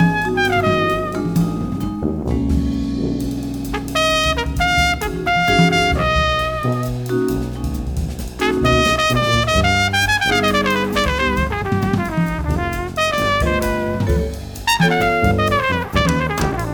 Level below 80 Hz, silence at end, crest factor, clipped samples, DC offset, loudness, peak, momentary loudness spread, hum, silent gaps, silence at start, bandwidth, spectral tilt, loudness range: -28 dBFS; 0 s; 18 dB; under 0.1%; under 0.1%; -18 LUFS; 0 dBFS; 8 LU; none; none; 0 s; over 20 kHz; -5 dB/octave; 3 LU